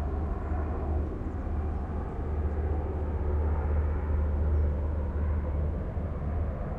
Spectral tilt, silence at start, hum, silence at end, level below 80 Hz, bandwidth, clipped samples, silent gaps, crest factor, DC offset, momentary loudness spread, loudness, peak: -10.5 dB/octave; 0 s; none; 0 s; -30 dBFS; 2.9 kHz; under 0.1%; none; 12 dB; under 0.1%; 5 LU; -32 LUFS; -18 dBFS